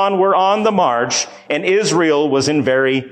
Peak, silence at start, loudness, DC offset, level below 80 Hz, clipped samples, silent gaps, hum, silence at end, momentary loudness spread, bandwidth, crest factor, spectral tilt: -4 dBFS; 0 s; -15 LUFS; under 0.1%; -58 dBFS; under 0.1%; none; none; 0.05 s; 5 LU; 10 kHz; 12 dB; -4 dB/octave